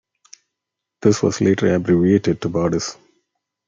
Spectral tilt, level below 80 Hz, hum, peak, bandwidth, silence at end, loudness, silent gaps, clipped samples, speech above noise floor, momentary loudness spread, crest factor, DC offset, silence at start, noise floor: -6 dB/octave; -54 dBFS; 50 Hz at -40 dBFS; -2 dBFS; 7.6 kHz; 0.75 s; -18 LUFS; none; under 0.1%; 65 dB; 6 LU; 18 dB; under 0.1%; 1 s; -82 dBFS